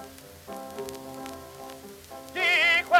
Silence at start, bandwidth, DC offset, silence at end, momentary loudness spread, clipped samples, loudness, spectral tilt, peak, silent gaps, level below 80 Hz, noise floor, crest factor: 0 s; 16.5 kHz; under 0.1%; 0 s; 24 LU; under 0.1%; -24 LUFS; -2 dB/octave; -6 dBFS; none; -64 dBFS; -45 dBFS; 22 dB